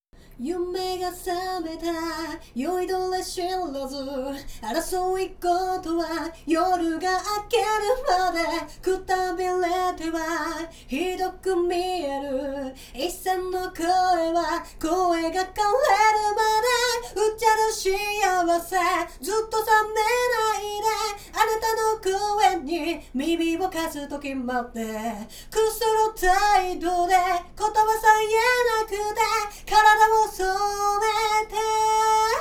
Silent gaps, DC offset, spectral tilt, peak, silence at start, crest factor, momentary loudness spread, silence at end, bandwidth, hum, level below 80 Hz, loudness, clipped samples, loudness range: none; under 0.1%; -2.5 dB/octave; -4 dBFS; 0.3 s; 20 dB; 10 LU; 0 s; 20 kHz; none; -46 dBFS; -24 LUFS; under 0.1%; 7 LU